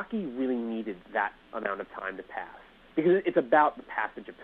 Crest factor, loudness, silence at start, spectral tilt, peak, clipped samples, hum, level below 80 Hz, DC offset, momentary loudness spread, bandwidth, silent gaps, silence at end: 20 dB; -29 LUFS; 0 s; -8.5 dB/octave; -10 dBFS; under 0.1%; none; -64 dBFS; under 0.1%; 14 LU; 4.2 kHz; none; 0 s